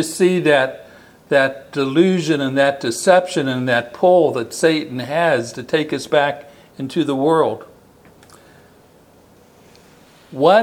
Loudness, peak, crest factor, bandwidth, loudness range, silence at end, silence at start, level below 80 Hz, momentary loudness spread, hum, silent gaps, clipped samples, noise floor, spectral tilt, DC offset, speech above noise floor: -17 LUFS; 0 dBFS; 18 dB; 16.5 kHz; 7 LU; 0 s; 0 s; -64 dBFS; 9 LU; none; none; under 0.1%; -49 dBFS; -5 dB/octave; under 0.1%; 33 dB